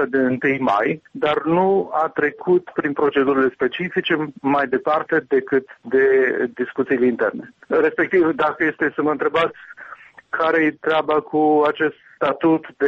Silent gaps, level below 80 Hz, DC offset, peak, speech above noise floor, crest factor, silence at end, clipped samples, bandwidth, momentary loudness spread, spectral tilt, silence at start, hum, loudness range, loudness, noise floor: none; -60 dBFS; under 0.1%; -6 dBFS; 23 dB; 12 dB; 0 s; under 0.1%; 6.4 kHz; 6 LU; -7.5 dB/octave; 0 s; none; 1 LU; -19 LUFS; -42 dBFS